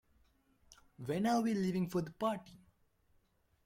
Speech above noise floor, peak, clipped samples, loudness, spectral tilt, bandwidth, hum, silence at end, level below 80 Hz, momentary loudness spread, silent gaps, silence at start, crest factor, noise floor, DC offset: 39 dB; -22 dBFS; under 0.1%; -36 LUFS; -6.5 dB/octave; 16.5 kHz; none; 1.1 s; -70 dBFS; 10 LU; none; 0.7 s; 18 dB; -74 dBFS; under 0.1%